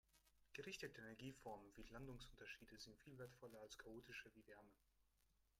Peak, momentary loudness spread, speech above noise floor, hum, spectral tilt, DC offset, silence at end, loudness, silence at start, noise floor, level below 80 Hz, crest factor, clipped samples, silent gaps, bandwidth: -38 dBFS; 7 LU; 23 dB; none; -4 dB/octave; under 0.1%; 0.05 s; -59 LUFS; 0.05 s; -83 dBFS; -74 dBFS; 22 dB; under 0.1%; none; 16 kHz